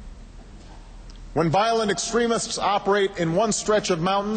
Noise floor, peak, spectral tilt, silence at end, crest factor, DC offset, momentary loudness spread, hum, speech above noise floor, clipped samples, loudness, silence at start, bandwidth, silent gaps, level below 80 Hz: -42 dBFS; -8 dBFS; -4 dB/octave; 0 s; 14 dB; under 0.1%; 3 LU; none; 20 dB; under 0.1%; -22 LUFS; 0 s; 9.2 kHz; none; -44 dBFS